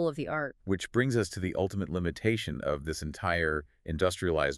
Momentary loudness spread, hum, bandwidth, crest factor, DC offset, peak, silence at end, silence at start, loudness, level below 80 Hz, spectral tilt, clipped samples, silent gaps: 6 LU; none; 13.5 kHz; 18 dB; under 0.1%; -14 dBFS; 0 s; 0 s; -31 LUFS; -48 dBFS; -5.5 dB/octave; under 0.1%; none